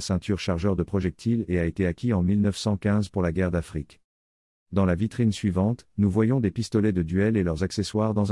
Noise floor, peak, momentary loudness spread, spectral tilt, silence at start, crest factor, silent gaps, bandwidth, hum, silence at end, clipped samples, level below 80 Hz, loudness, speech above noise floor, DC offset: under -90 dBFS; -10 dBFS; 4 LU; -7 dB/octave; 0 s; 14 dB; 4.04-4.66 s; 12 kHz; none; 0 s; under 0.1%; -48 dBFS; -25 LUFS; over 66 dB; under 0.1%